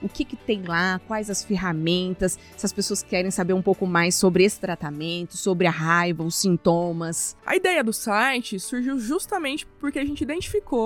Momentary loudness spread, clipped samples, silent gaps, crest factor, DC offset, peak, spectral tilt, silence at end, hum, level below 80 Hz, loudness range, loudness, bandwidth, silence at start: 9 LU; under 0.1%; none; 18 dB; under 0.1%; -6 dBFS; -4 dB/octave; 0 s; none; -48 dBFS; 3 LU; -23 LUFS; 19 kHz; 0 s